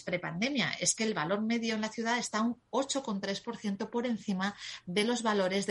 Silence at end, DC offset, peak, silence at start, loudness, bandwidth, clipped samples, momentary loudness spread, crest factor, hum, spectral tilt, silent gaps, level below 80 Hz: 0 s; under 0.1%; -16 dBFS; 0 s; -32 LUFS; 11.5 kHz; under 0.1%; 7 LU; 18 dB; none; -3.5 dB/octave; none; -72 dBFS